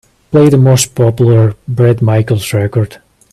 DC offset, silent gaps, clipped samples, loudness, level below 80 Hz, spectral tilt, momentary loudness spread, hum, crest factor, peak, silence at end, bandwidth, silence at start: under 0.1%; none; under 0.1%; -10 LUFS; -44 dBFS; -6.5 dB/octave; 7 LU; none; 10 dB; 0 dBFS; 0.4 s; 14 kHz; 0.3 s